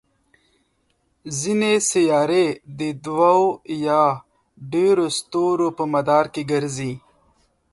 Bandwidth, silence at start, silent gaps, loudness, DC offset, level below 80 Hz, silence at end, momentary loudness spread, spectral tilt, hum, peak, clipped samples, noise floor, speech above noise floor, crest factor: 11.5 kHz; 1.25 s; none; -20 LUFS; under 0.1%; -62 dBFS; 0.75 s; 11 LU; -4.5 dB/octave; none; -4 dBFS; under 0.1%; -67 dBFS; 48 dB; 18 dB